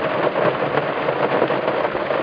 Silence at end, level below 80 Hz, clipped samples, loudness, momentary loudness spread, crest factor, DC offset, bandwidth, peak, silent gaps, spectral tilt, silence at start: 0 s; -56 dBFS; under 0.1%; -20 LUFS; 2 LU; 16 dB; under 0.1%; 5.2 kHz; -2 dBFS; none; -8 dB/octave; 0 s